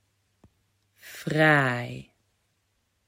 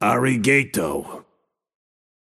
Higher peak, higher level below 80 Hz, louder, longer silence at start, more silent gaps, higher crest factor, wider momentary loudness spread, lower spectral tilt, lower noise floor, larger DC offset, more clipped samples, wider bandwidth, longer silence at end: second, -8 dBFS vs -4 dBFS; second, -66 dBFS vs -56 dBFS; second, -23 LUFS vs -20 LUFS; first, 1.05 s vs 0 s; neither; about the same, 22 dB vs 20 dB; first, 23 LU vs 13 LU; about the same, -6 dB/octave vs -5 dB/octave; first, -73 dBFS vs -69 dBFS; neither; neither; about the same, 16.5 kHz vs 16 kHz; about the same, 1.05 s vs 1 s